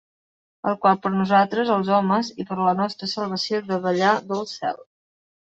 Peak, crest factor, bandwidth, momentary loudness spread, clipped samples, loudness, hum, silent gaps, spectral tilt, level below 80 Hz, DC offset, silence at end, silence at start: -4 dBFS; 18 dB; 8 kHz; 10 LU; under 0.1%; -22 LUFS; none; none; -6 dB/octave; -66 dBFS; under 0.1%; 0.6 s; 0.65 s